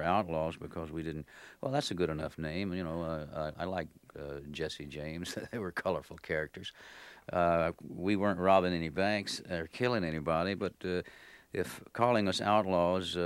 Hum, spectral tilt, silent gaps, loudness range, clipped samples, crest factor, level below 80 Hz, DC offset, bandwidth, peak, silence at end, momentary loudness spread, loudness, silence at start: none; -5.5 dB/octave; none; 8 LU; under 0.1%; 22 dB; -58 dBFS; under 0.1%; 16.5 kHz; -12 dBFS; 0 s; 14 LU; -34 LUFS; 0 s